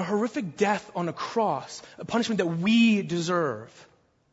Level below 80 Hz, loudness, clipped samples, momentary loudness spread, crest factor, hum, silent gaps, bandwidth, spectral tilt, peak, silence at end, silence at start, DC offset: -68 dBFS; -26 LUFS; under 0.1%; 12 LU; 16 dB; none; none; 8 kHz; -5.5 dB/octave; -10 dBFS; 0.5 s; 0 s; under 0.1%